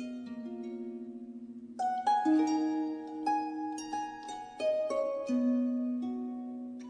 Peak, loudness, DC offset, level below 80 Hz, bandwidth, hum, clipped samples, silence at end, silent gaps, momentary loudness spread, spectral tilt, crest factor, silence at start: -18 dBFS; -33 LUFS; under 0.1%; -76 dBFS; 10 kHz; none; under 0.1%; 0 s; none; 15 LU; -4.5 dB/octave; 14 dB; 0 s